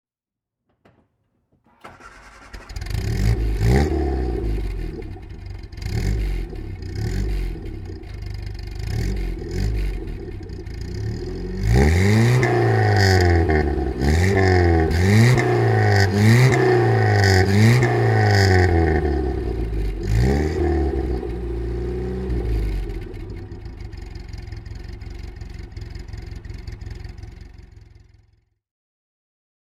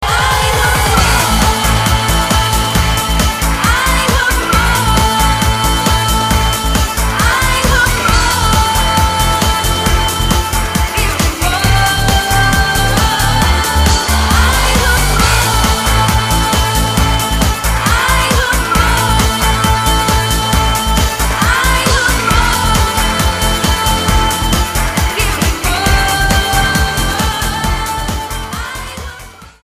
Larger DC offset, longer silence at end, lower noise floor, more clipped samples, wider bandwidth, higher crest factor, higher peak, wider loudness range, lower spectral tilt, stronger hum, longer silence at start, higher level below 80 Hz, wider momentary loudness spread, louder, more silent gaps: neither; first, 2 s vs 0.15 s; first, -88 dBFS vs -33 dBFS; neither; about the same, 14.5 kHz vs 15.5 kHz; first, 18 dB vs 12 dB; about the same, -2 dBFS vs 0 dBFS; first, 20 LU vs 2 LU; first, -6.5 dB/octave vs -3.5 dB/octave; neither; first, 1.85 s vs 0 s; second, -28 dBFS vs -16 dBFS; first, 21 LU vs 4 LU; second, -19 LUFS vs -12 LUFS; neither